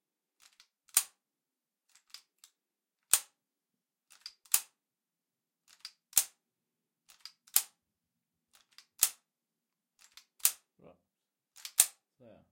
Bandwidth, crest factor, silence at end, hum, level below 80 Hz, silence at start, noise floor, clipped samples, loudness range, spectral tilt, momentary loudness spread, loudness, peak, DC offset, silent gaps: 16.5 kHz; 38 dB; 0.6 s; none; -78 dBFS; 0.95 s; under -90 dBFS; under 0.1%; 2 LU; 3 dB/octave; 24 LU; -30 LUFS; -2 dBFS; under 0.1%; none